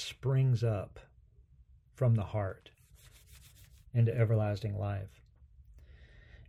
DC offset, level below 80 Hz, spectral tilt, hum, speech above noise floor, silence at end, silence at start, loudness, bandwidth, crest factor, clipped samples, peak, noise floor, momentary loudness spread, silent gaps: under 0.1%; -58 dBFS; -7.5 dB/octave; none; 31 dB; 0.05 s; 0 s; -32 LUFS; 11 kHz; 18 dB; under 0.1%; -16 dBFS; -62 dBFS; 13 LU; none